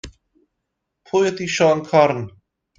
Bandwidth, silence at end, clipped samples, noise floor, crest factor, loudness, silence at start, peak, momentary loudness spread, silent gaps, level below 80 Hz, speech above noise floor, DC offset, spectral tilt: 9.2 kHz; 0.5 s; under 0.1%; -78 dBFS; 20 dB; -18 LUFS; 0.05 s; 0 dBFS; 10 LU; none; -54 dBFS; 60 dB; under 0.1%; -5 dB/octave